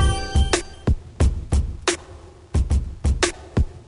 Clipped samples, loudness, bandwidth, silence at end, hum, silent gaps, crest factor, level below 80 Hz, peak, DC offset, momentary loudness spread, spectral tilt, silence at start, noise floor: under 0.1%; -23 LUFS; 11 kHz; 0.05 s; none; none; 18 dB; -24 dBFS; -4 dBFS; under 0.1%; 5 LU; -4.5 dB/octave; 0 s; -42 dBFS